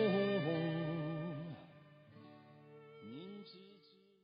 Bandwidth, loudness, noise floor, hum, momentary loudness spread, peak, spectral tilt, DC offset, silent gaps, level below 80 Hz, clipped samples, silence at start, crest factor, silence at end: 5 kHz; -40 LUFS; -66 dBFS; none; 24 LU; -22 dBFS; -6 dB/octave; under 0.1%; none; -82 dBFS; under 0.1%; 0 s; 18 dB; 0.45 s